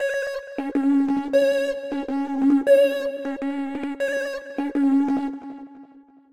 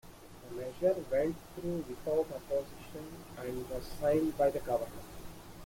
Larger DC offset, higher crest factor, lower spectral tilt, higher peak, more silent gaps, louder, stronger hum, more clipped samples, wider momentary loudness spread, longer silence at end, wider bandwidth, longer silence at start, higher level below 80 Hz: first, 0.2% vs under 0.1%; about the same, 16 dB vs 18 dB; second, -4.5 dB/octave vs -6.5 dB/octave; first, -8 dBFS vs -18 dBFS; neither; first, -23 LUFS vs -35 LUFS; neither; neither; second, 12 LU vs 18 LU; first, 0.3 s vs 0 s; second, 14 kHz vs 16.5 kHz; about the same, 0 s vs 0.05 s; second, -62 dBFS vs -54 dBFS